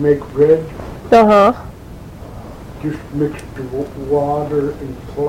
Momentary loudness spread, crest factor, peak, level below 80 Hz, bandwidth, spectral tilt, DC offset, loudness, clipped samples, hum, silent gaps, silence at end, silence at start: 23 LU; 16 dB; 0 dBFS; -38 dBFS; 15.5 kHz; -7.5 dB/octave; under 0.1%; -15 LUFS; under 0.1%; none; none; 0 s; 0 s